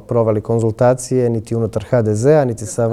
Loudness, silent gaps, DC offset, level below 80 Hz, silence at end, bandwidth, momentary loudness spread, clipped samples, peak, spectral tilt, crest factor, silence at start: -16 LUFS; none; under 0.1%; -46 dBFS; 0 s; 12.5 kHz; 7 LU; under 0.1%; -2 dBFS; -7 dB/octave; 14 dB; 0.1 s